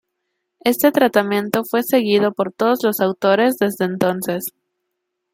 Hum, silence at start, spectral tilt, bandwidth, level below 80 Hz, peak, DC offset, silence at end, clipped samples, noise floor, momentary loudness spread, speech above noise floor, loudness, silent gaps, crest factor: none; 0.65 s; -5 dB/octave; 16.5 kHz; -64 dBFS; 0 dBFS; under 0.1%; 0.85 s; under 0.1%; -76 dBFS; 7 LU; 59 dB; -18 LUFS; none; 18 dB